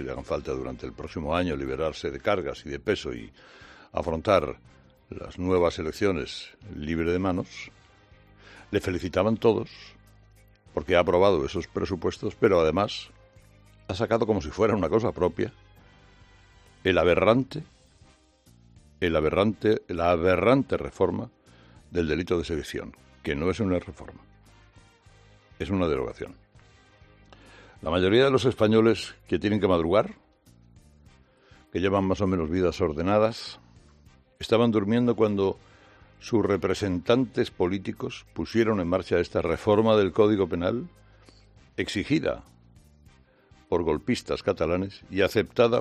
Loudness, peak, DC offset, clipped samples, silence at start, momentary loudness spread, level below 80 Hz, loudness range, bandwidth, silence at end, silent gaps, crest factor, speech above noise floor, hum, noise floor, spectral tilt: -26 LUFS; -6 dBFS; under 0.1%; under 0.1%; 0 s; 16 LU; -50 dBFS; 6 LU; 13.5 kHz; 0 s; none; 22 dB; 33 dB; none; -58 dBFS; -6.5 dB/octave